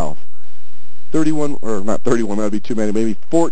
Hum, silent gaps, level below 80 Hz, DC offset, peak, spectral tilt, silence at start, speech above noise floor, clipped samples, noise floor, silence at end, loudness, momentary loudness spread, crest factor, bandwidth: none; none; -48 dBFS; 40%; 0 dBFS; -6.5 dB/octave; 0 s; 37 dB; under 0.1%; -55 dBFS; 0 s; -20 LUFS; 5 LU; 16 dB; 8 kHz